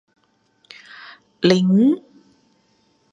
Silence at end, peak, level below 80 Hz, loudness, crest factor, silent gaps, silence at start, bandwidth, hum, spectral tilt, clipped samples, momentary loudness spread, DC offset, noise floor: 1.15 s; -2 dBFS; -66 dBFS; -17 LUFS; 20 dB; none; 1.4 s; 7.8 kHz; none; -7 dB/octave; under 0.1%; 25 LU; under 0.1%; -62 dBFS